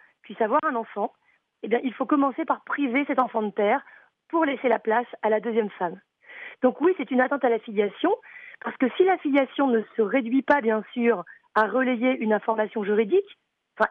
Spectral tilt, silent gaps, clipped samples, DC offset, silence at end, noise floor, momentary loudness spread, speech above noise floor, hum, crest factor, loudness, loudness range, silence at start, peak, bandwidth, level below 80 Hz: -8 dB/octave; none; under 0.1%; under 0.1%; 0 s; -44 dBFS; 8 LU; 20 dB; none; 16 dB; -24 LUFS; 2 LU; 0.3 s; -8 dBFS; 4.8 kHz; -76 dBFS